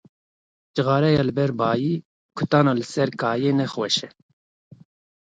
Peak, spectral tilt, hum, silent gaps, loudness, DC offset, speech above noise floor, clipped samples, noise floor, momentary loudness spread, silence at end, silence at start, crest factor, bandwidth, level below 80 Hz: -4 dBFS; -6 dB/octave; none; 2.05-2.29 s; -22 LUFS; under 0.1%; over 69 dB; under 0.1%; under -90 dBFS; 11 LU; 1.15 s; 0.75 s; 20 dB; 9.2 kHz; -58 dBFS